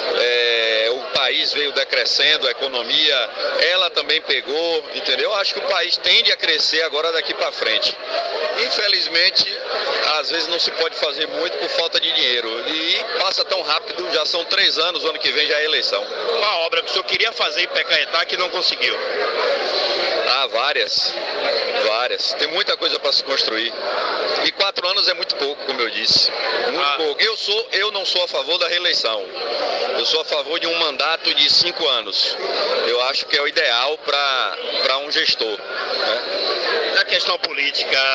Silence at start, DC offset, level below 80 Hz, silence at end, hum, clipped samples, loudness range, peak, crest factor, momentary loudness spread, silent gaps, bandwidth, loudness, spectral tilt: 0 s; under 0.1%; -68 dBFS; 0 s; none; under 0.1%; 2 LU; -4 dBFS; 16 dB; 7 LU; none; 9.6 kHz; -18 LUFS; -0.5 dB/octave